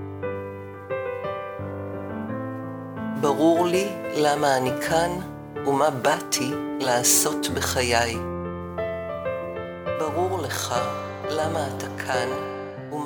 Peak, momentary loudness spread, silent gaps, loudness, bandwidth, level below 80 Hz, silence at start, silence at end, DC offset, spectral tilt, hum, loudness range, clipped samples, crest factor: -4 dBFS; 13 LU; none; -25 LUFS; over 20 kHz; -52 dBFS; 0 s; 0 s; under 0.1%; -3.5 dB/octave; none; 6 LU; under 0.1%; 22 dB